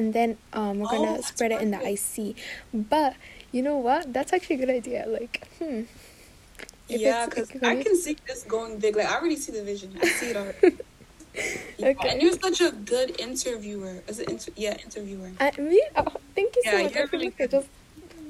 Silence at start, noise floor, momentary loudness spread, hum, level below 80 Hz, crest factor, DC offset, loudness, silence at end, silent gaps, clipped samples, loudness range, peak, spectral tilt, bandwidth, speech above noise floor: 0 s; -49 dBFS; 13 LU; none; -54 dBFS; 20 dB; under 0.1%; -26 LUFS; 0 s; none; under 0.1%; 4 LU; -6 dBFS; -3.5 dB/octave; 15.5 kHz; 23 dB